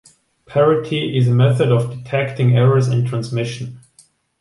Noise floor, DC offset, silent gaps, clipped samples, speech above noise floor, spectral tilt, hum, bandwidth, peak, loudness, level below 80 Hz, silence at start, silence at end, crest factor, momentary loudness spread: -54 dBFS; under 0.1%; none; under 0.1%; 38 dB; -7.5 dB/octave; none; 11.5 kHz; -4 dBFS; -17 LUFS; -54 dBFS; 0.5 s; 0.6 s; 14 dB; 9 LU